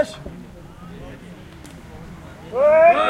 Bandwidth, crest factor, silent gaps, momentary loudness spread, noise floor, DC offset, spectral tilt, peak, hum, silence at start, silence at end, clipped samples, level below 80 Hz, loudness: 11.5 kHz; 16 dB; none; 26 LU; -40 dBFS; under 0.1%; -5.5 dB/octave; -4 dBFS; none; 0 s; 0 s; under 0.1%; -46 dBFS; -16 LUFS